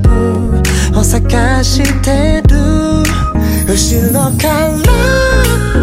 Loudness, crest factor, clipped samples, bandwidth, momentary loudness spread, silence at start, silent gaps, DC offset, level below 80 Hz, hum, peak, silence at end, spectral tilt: -11 LUFS; 10 dB; under 0.1%; 16.5 kHz; 3 LU; 0 s; none; under 0.1%; -14 dBFS; none; 0 dBFS; 0 s; -5 dB/octave